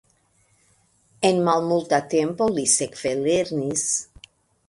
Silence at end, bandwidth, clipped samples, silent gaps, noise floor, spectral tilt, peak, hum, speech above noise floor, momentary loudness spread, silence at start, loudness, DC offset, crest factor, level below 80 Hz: 0.65 s; 11.5 kHz; under 0.1%; none; -63 dBFS; -3.5 dB/octave; -4 dBFS; none; 41 dB; 5 LU; 1.2 s; -22 LUFS; under 0.1%; 20 dB; -60 dBFS